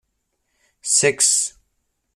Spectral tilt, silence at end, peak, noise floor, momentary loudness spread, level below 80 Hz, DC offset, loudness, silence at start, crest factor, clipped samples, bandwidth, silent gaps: -0.5 dB/octave; 0.65 s; -4 dBFS; -73 dBFS; 13 LU; -66 dBFS; under 0.1%; -16 LUFS; 0.85 s; 20 dB; under 0.1%; 15 kHz; none